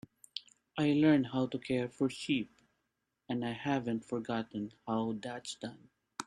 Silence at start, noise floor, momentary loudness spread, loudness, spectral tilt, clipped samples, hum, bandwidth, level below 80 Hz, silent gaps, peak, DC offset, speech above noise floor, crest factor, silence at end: 0.35 s; -84 dBFS; 17 LU; -34 LUFS; -6 dB/octave; under 0.1%; none; 10.5 kHz; -70 dBFS; none; -16 dBFS; under 0.1%; 50 dB; 20 dB; 0.05 s